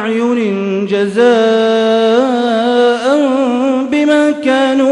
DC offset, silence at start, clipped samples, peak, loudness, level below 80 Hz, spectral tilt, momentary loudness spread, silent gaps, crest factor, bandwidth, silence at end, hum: under 0.1%; 0 s; under 0.1%; 0 dBFS; -12 LUFS; -58 dBFS; -5.5 dB/octave; 4 LU; none; 12 dB; 11 kHz; 0 s; none